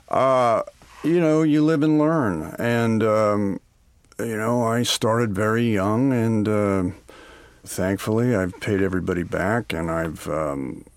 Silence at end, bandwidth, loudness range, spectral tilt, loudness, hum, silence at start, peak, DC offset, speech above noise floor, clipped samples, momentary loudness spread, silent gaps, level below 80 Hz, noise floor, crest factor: 0.15 s; 16.5 kHz; 4 LU; -6 dB/octave; -22 LUFS; none; 0.1 s; -6 dBFS; under 0.1%; 36 dB; under 0.1%; 9 LU; none; -50 dBFS; -57 dBFS; 16 dB